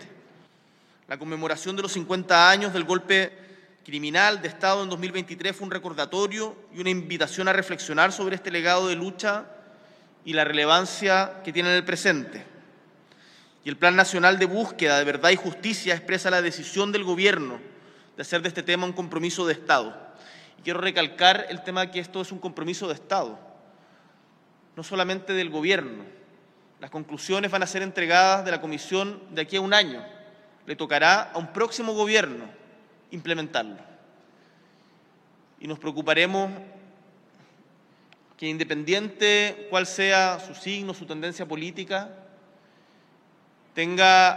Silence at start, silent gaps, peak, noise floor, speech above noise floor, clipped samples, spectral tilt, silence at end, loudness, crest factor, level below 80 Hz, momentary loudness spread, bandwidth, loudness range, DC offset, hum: 0 s; none; -2 dBFS; -60 dBFS; 35 dB; under 0.1%; -3 dB/octave; 0 s; -23 LUFS; 24 dB; -76 dBFS; 16 LU; 13 kHz; 8 LU; under 0.1%; none